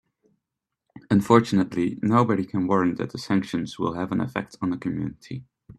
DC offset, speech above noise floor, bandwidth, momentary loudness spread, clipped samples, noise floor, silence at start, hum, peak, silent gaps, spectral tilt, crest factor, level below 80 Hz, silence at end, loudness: under 0.1%; 61 dB; 13 kHz; 13 LU; under 0.1%; -84 dBFS; 0.95 s; none; -2 dBFS; none; -7 dB/octave; 22 dB; -58 dBFS; 0.35 s; -24 LUFS